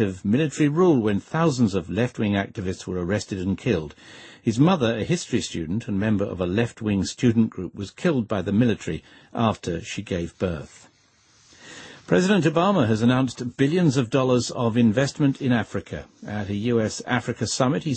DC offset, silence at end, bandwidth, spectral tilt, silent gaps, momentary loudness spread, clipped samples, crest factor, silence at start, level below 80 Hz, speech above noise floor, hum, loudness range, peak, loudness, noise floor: under 0.1%; 0 s; 8.8 kHz; -6 dB/octave; none; 12 LU; under 0.1%; 18 dB; 0 s; -52 dBFS; 37 dB; none; 5 LU; -6 dBFS; -23 LUFS; -59 dBFS